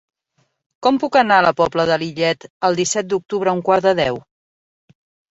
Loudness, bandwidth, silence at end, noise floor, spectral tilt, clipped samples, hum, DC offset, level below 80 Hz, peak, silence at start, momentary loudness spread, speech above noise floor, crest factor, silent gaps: -17 LUFS; 8.2 kHz; 1.1 s; -66 dBFS; -4 dB/octave; under 0.1%; none; under 0.1%; -56 dBFS; -2 dBFS; 0.8 s; 7 LU; 49 dB; 18 dB; 2.50-2.61 s